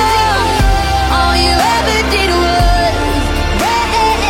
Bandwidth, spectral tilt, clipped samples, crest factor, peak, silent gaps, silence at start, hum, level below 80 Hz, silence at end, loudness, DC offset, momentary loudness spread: 16.5 kHz; -4 dB/octave; under 0.1%; 12 dB; 0 dBFS; none; 0 s; none; -18 dBFS; 0 s; -12 LUFS; under 0.1%; 4 LU